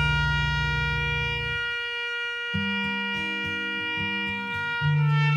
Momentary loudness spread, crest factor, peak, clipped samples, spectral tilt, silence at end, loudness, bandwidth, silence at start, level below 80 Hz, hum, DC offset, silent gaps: 5 LU; 14 dB; -12 dBFS; under 0.1%; -5.5 dB/octave; 0 s; -26 LUFS; 9 kHz; 0 s; -40 dBFS; none; under 0.1%; none